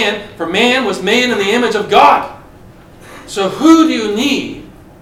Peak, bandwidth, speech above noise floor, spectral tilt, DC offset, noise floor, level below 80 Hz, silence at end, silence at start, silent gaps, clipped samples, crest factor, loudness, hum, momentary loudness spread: 0 dBFS; 15 kHz; 26 dB; -3.5 dB/octave; under 0.1%; -38 dBFS; -46 dBFS; 0.3 s; 0 s; none; 0.3%; 14 dB; -12 LUFS; none; 14 LU